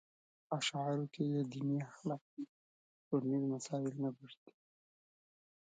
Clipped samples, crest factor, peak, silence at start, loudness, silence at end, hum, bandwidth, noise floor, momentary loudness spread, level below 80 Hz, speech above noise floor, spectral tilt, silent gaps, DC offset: under 0.1%; 18 dB; -22 dBFS; 0.5 s; -39 LUFS; 1.35 s; none; 9 kHz; under -90 dBFS; 14 LU; -88 dBFS; over 51 dB; -6 dB/octave; 2.21-2.37 s, 2.49-3.11 s; under 0.1%